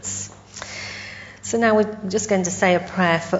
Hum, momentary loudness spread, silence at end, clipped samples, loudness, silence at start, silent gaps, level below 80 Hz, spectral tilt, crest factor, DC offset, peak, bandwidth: 50 Hz at -40 dBFS; 15 LU; 0 s; under 0.1%; -21 LUFS; 0 s; none; -56 dBFS; -4 dB/octave; 18 dB; under 0.1%; -4 dBFS; 8 kHz